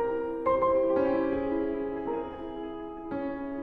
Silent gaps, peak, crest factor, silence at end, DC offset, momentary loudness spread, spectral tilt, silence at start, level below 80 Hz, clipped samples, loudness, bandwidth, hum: none; -14 dBFS; 14 dB; 0 s; under 0.1%; 13 LU; -9 dB/octave; 0 s; -52 dBFS; under 0.1%; -30 LUFS; 4.9 kHz; none